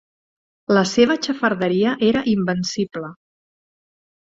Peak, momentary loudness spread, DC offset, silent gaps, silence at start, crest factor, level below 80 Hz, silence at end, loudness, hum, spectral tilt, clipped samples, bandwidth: -2 dBFS; 12 LU; under 0.1%; none; 0.7 s; 18 dB; -58 dBFS; 1.1 s; -19 LUFS; none; -5 dB/octave; under 0.1%; 7.8 kHz